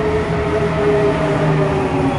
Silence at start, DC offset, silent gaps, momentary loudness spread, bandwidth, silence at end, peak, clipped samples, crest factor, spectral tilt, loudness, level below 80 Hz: 0 s; under 0.1%; none; 3 LU; 11 kHz; 0 s; -4 dBFS; under 0.1%; 12 dB; -7.5 dB/octave; -16 LUFS; -34 dBFS